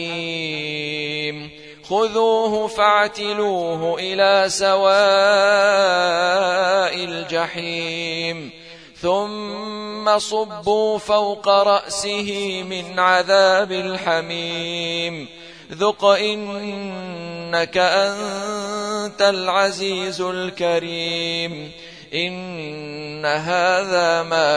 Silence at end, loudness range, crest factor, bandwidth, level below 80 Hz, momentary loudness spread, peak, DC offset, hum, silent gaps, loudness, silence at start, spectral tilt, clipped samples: 0 s; 7 LU; 18 dB; 10.5 kHz; -60 dBFS; 14 LU; 0 dBFS; 0.1%; none; none; -19 LUFS; 0 s; -3 dB/octave; under 0.1%